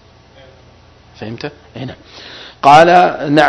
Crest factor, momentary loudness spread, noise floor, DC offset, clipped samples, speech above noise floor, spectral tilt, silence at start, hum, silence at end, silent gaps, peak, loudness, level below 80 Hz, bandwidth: 14 dB; 26 LU; -44 dBFS; under 0.1%; 1%; 32 dB; -5.5 dB/octave; 1.2 s; none; 0 s; none; 0 dBFS; -8 LUFS; -50 dBFS; 11 kHz